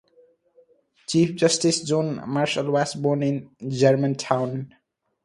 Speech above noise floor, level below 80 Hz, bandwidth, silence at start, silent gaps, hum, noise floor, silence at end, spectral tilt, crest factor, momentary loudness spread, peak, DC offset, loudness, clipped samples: 37 dB; -64 dBFS; 11.5 kHz; 1.1 s; none; none; -59 dBFS; 0.6 s; -5 dB/octave; 20 dB; 11 LU; -2 dBFS; under 0.1%; -23 LUFS; under 0.1%